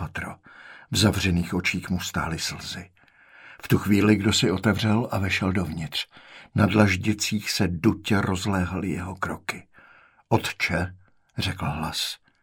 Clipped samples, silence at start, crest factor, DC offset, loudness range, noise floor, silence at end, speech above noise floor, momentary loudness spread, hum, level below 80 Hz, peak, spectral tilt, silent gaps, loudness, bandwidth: under 0.1%; 0 s; 22 dB; under 0.1%; 5 LU; -55 dBFS; 0.25 s; 31 dB; 14 LU; none; -48 dBFS; -4 dBFS; -5 dB/octave; none; -25 LUFS; 17.5 kHz